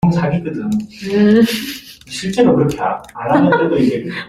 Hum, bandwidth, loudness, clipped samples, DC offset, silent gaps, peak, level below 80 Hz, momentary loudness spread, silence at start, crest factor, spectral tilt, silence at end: none; 15.5 kHz; -15 LUFS; under 0.1%; under 0.1%; none; -2 dBFS; -46 dBFS; 12 LU; 0.05 s; 14 dB; -6.5 dB/octave; 0 s